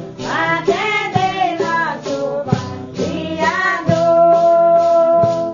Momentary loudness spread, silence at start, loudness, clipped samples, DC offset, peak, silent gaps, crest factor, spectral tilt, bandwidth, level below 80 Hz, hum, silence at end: 10 LU; 0 s; -15 LUFS; under 0.1%; under 0.1%; 0 dBFS; none; 14 dB; -5.5 dB/octave; 7.4 kHz; -50 dBFS; none; 0 s